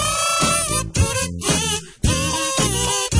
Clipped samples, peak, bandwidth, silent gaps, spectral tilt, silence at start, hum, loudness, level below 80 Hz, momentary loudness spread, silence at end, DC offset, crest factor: under 0.1%; -4 dBFS; 11 kHz; none; -3 dB/octave; 0 s; none; -19 LUFS; -32 dBFS; 5 LU; 0 s; under 0.1%; 16 dB